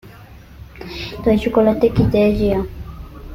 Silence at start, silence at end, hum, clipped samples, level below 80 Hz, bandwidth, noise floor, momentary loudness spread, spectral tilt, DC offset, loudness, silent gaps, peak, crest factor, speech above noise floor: 0.05 s; 0 s; none; under 0.1%; -32 dBFS; 16 kHz; -40 dBFS; 20 LU; -8 dB/octave; under 0.1%; -17 LUFS; none; -2 dBFS; 16 dB; 24 dB